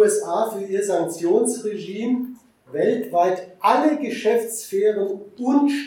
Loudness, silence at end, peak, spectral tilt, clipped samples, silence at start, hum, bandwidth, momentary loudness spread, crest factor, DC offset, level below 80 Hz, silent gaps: -22 LUFS; 0 s; -4 dBFS; -4.5 dB/octave; under 0.1%; 0 s; none; 17.5 kHz; 9 LU; 18 dB; under 0.1%; -76 dBFS; none